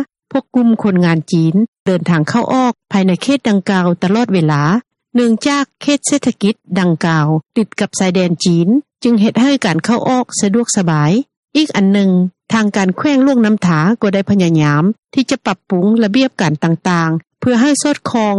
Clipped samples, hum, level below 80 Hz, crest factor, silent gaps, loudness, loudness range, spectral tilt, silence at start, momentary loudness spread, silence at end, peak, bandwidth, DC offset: under 0.1%; none; -56 dBFS; 12 dB; 1.68-1.73 s, 1.80-1.86 s, 11.37-11.43 s, 14.99-15.03 s; -14 LUFS; 1 LU; -5.5 dB/octave; 0 s; 5 LU; 0 s; 0 dBFS; 11.5 kHz; under 0.1%